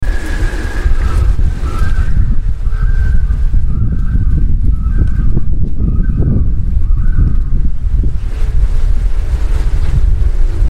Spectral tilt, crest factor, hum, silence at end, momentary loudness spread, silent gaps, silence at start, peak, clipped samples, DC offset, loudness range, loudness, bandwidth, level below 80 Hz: -7.5 dB/octave; 8 dB; none; 0 s; 4 LU; none; 0 s; 0 dBFS; under 0.1%; under 0.1%; 1 LU; -16 LUFS; 5.6 kHz; -10 dBFS